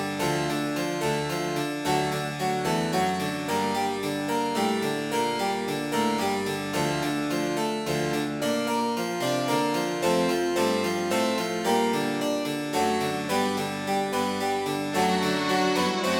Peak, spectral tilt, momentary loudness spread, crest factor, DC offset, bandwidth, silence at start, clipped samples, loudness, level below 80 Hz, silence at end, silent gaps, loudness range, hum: -10 dBFS; -4.5 dB/octave; 4 LU; 16 dB; under 0.1%; 18 kHz; 0 s; under 0.1%; -26 LUFS; -60 dBFS; 0 s; none; 2 LU; none